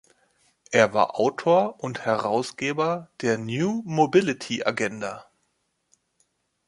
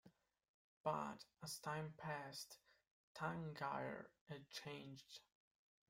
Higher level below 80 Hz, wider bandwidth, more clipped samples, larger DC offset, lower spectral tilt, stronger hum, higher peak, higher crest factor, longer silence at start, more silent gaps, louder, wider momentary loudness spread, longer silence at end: first, -68 dBFS vs -82 dBFS; second, 11.5 kHz vs 16 kHz; neither; neither; about the same, -5 dB/octave vs -4.5 dB/octave; neither; first, -2 dBFS vs -30 dBFS; about the same, 22 dB vs 22 dB; first, 0.7 s vs 0.05 s; second, none vs 0.49-0.84 s, 2.91-3.15 s, 4.21-4.26 s; first, -24 LUFS vs -50 LUFS; second, 8 LU vs 12 LU; first, 1.45 s vs 0.7 s